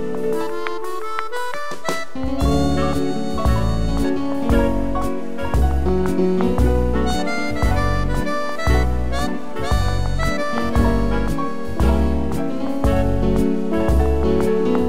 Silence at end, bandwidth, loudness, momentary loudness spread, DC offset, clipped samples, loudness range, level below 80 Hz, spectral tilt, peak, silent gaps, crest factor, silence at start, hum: 0 s; 15.5 kHz; -21 LUFS; 7 LU; 7%; under 0.1%; 2 LU; -24 dBFS; -7 dB/octave; -4 dBFS; none; 14 dB; 0 s; none